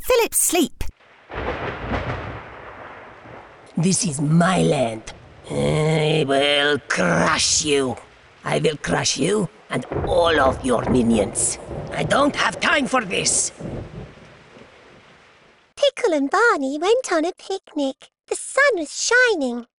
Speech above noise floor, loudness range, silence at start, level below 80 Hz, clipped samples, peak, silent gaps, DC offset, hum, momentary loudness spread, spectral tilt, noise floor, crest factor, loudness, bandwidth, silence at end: 33 dB; 5 LU; 0 s; -42 dBFS; under 0.1%; -6 dBFS; none; under 0.1%; none; 17 LU; -3.5 dB/octave; -53 dBFS; 16 dB; -20 LUFS; 11.5 kHz; 0.15 s